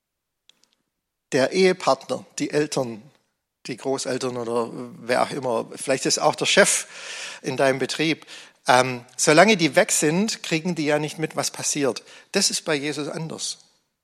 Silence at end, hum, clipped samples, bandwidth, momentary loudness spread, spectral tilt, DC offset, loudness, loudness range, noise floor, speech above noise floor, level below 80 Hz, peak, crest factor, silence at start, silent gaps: 0.5 s; none; under 0.1%; 15 kHz; 14 LU; -3 dB/octave; under 0.1%; -22 LUFS; 7 LU; -79 dBFS; 57 dB; -74 dBFS; 0 dBFS; 22 dB; 1.3 s; none